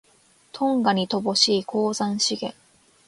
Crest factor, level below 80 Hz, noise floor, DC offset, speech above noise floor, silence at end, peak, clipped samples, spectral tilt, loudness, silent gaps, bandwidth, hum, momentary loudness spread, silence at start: 20 dB; -68 dBFS; -59 dBFS; under 0.1%; 36 dB; 0.55 s; -4 dBFS; under 0.1%; -3.5 dB/octave; -22 LUFS; none; 11.5 kHz; none; 11 LU; 0.55 s